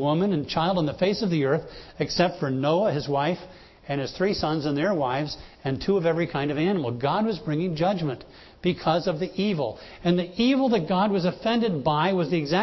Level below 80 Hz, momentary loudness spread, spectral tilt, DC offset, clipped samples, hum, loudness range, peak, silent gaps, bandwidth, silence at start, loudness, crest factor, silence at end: -52 dBFS; 7 LU; -7 dB/octave; under 0.1%; under 0.1%; none; 2 LU; -8 dBFS; none; 6.2 kHz; 0 s; -25 LUFS; 16 dB; 0 s